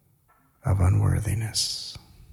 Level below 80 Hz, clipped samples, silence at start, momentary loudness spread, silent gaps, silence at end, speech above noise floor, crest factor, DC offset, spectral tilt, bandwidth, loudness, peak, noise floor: -44 dBFS; under 0.1%; 0.65 s; 14 LU; none; 0.35 s; 39 dB; 14 dB; under 0.1%; -4.5 dB/octave; 14.5 kHz; -25 LUFS; -12 dBFS; -63 dBFS